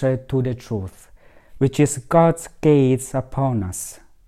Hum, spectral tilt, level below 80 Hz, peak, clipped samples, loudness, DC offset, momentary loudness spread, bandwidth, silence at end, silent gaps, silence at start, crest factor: none; -7 dB/octave; -46 dBFS; -2 dBFS; under 0.1%; -20 LUFS; under 0.1%; 13 LU; 14.5 kHz; 0.3 s; none; 0 s; 18 dB